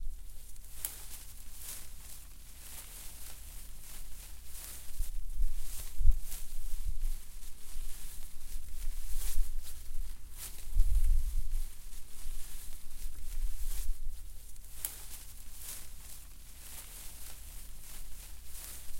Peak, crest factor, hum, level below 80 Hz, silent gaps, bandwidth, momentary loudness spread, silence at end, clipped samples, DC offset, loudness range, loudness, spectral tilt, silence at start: -8 dBFS; 22 dB; none; -36 dBFS; none; 16.5 kHz; 12 LU; 0 s; under 0.1%; under 0.1%; 7 LU; -44 LUFS; -2.5 dB/octave; 0 s